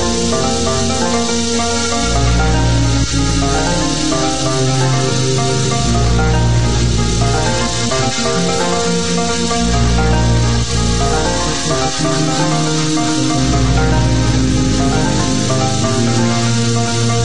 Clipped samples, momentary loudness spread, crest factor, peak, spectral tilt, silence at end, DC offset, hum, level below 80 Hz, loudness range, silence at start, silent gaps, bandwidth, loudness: under 0.1%; 2 LU; 12 dB; -2 dBFS; -4.5 dB/octave; 0 s; 6%; none; -22 dBFS; 1 LU; 0 s; none; 10.5 kHz; -14 LUFS